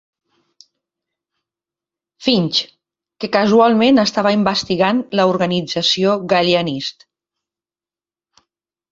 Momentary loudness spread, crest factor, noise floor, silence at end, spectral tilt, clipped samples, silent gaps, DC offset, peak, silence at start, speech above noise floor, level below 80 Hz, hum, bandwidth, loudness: 10 LU; 18 dB; under -90 dBFS; 2 s; -5 dB/octave; under 0.1%; none; under 0.1%; -2 dBFS; 2.2 s; over 75 dB; -58 dBFS; none; 7.8 kHz; -15 LUFS